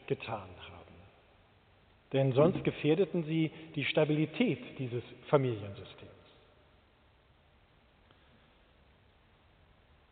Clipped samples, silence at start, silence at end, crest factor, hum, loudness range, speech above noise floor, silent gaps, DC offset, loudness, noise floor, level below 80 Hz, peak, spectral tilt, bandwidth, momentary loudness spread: under 0.1%; 0.1 s; 4 s; 24 dB; none; 8 LU; 34 dB; none; under 0.1%; -32 LUFS; -65 dBFS; -68 dBFS; -10 dBFS; -6 dB/octave; 4.6 kHz; 21 LU